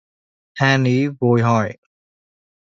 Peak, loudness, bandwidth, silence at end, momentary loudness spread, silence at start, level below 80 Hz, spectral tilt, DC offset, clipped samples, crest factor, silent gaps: -2 dBFS; -18 LUFS; 7.6 kHz; 0.95 s; 9 LU; 0.55 s; -56 dBFS; -6.5 dB/octave; under 0.1%; under 0.1%; 18 dB; none